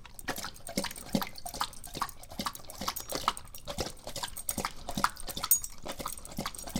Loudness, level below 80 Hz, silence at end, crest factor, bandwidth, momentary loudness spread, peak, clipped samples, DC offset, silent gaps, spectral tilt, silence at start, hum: -35 LUFS; -48 dBFS; 0 s; 28 dB; 17 kHz; 11 LU; -8 dBFS; under 0.1%; under 0.1%; none; -2.5 dB/octave; 0 s; none